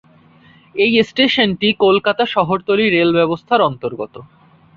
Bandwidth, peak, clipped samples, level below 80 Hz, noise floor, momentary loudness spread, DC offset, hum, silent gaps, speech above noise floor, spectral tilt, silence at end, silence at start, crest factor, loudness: 7.2 kHz; -2 dBFS; under 0.1%; -54 dBFS; -48 dBFS; 12 LU; under 0.1%; none; none; 32 dB; -6.5 dB/octave; 0.5 s; 0.75 s; 16 dB; -15 LUFS